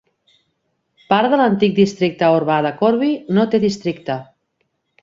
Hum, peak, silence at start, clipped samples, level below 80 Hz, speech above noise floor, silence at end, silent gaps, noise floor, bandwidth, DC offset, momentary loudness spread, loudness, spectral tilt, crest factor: none; -2 dBFS; 1.1 s; under 0.1%; -58 dBFS; 54 dB; 0.8 s; none; -70 dBFS; 7.6 kHz; under 0.1%; 9 LU; -17 LUFS; -6.5 dB/octave; 16 dB